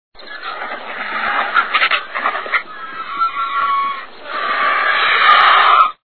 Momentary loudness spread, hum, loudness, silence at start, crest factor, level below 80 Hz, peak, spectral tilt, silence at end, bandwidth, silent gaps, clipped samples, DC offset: 18 LU; none; -14 LUFS; 0.1 s; 16 dB; -58 dBFS; 0 dBFS; -3 dB/octave; 0.05 s; 5.4 kHz; none; under 0.1%; 1%